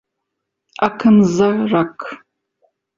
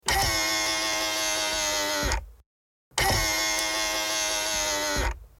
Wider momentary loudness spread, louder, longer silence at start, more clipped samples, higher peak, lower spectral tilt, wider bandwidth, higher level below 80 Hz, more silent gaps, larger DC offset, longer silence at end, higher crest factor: first, 15 LU vs 4 LU; first, -15 LUFS vs -25 LUFS; first, 0.8 s vs 0.05 s; neither; first, 0 dBFS vs -8 dBFS; first, -7 dB/octave vs -1 dB/octave; second, 7.4 kHz vs 17 kHz; second, -54 dBFS vs -38 dBFS; second, none vs 2.46-2.91 s; neither; first, 0.85 s vs 0.15 s; about the same, 18 dB vs 20 dB